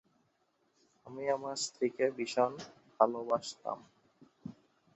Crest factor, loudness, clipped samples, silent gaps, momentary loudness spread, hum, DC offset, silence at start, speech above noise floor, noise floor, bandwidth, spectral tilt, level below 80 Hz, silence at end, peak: 26 dB; -34 LUFS; under 0.1%; none; 20 LU; none; under 0.1%; 1.05 s; 42 dB; -76 dBFS; 8 kHz; -3 dB/octave; -80 dBFS; 0.45 s; -10 dBFS